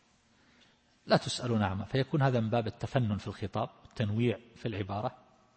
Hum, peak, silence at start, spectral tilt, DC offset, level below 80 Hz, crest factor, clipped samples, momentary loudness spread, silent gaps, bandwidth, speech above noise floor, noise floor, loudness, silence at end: none; -12 dBFS; 1.05 s; -6.5 dB/octave; under 0.1%; -62 dBFS; 20 dB; under 0.1%; 9 LU; none; 8.8 kHz; 35 dB; -66 dBFS; -32 LUFS; 0.4 s